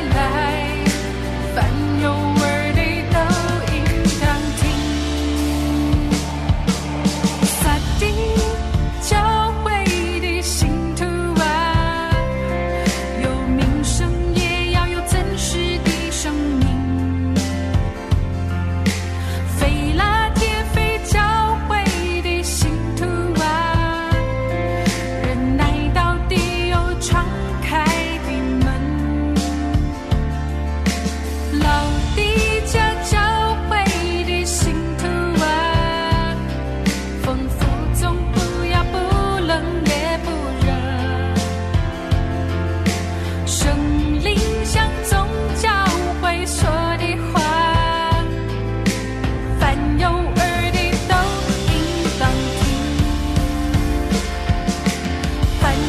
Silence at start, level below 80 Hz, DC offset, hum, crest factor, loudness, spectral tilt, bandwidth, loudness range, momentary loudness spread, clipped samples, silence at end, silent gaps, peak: 0 s; -24 dBFS; under 0.1%; none; 12 dB; -19 LUFS; -5 dB/octave; 14 kHz; 2 LU; 4 LU; under 0.1%; 0 s; none; -6 dBFS